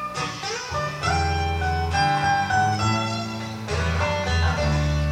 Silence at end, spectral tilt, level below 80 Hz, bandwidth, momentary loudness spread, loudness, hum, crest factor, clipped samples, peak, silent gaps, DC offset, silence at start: 0 s; -5 dB/octave; -32 dBFS; 13.5 kHz; 7 LU; -23 LUFS; none; 14 dB; under 0.1%; -10 dBFS; none; under 0.1%; 0 s